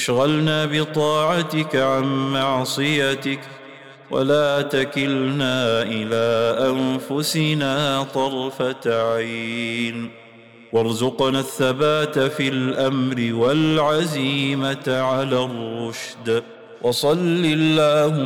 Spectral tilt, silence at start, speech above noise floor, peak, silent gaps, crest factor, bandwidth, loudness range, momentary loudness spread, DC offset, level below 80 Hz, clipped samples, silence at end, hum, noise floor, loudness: -5 dB/octave; 0 s; 25 dB; -8 dBFS; none; 12 dB; 18 kHz; 3 LU; 7 LU; 0.1%; -58 dBFS; under 0.1%; 0 s; none; -45 dBFS; -20 LUFS